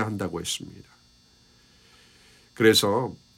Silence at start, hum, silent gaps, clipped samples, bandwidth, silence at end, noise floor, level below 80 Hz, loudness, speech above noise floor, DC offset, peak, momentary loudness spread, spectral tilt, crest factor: 0 s; none; none; under 0.1%; 16 kHz; 0.2 s; -59 dBFS; -60 dBFS; -23 LUFS; 34 dB; under 0.1%; -6 dBFS; 13 LU; -3.5 dB/octave; 22 dB